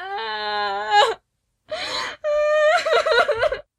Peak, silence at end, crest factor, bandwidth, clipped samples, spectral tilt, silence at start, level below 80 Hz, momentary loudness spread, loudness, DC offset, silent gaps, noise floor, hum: -4 dBFS; 0.2 s; 16 dB; 12 kHz; under 0.1%; -1 dB/octave; 0 s; -54 dBFS; 10 LU; -20 LUFS; under 0.1%; none; -70 dBFS; none